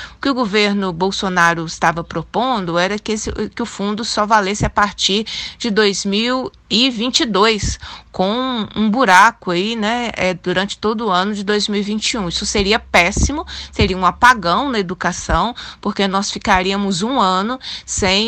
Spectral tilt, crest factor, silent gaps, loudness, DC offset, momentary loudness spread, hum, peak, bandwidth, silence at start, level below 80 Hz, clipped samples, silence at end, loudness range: -3.5 dB/octave; 16 dB; none; -16 LUFS; under 0.1%; 9 LU; none; 0 dBFS; 15 kHz; 0 s; -34 dBFS; under 0.1%; 0 s; 3 LU